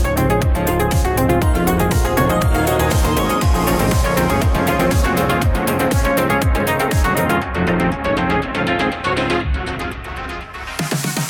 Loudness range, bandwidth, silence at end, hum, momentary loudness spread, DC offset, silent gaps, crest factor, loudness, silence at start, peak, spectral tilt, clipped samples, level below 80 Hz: 3 LU; 19 kHz; 0 s; none; 6 LU; under 0.1%; none; 14 dB; -17 LUFS; 0 s; -2 dBFS; -5.5 dB/octave; under 0.1%; -24 dBFS